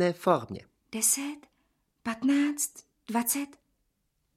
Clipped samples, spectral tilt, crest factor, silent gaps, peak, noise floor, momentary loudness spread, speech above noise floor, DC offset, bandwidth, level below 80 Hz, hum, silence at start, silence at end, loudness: under 0.1%; -3.5 dB/octave; 22 dB; none; -8 dBFS; -77 dBFS; 17 LU; 48 dB; under 0.1%; 16.5 kHz; -72 dBFS; none; 0 s; 0.9 s; -28 LUFS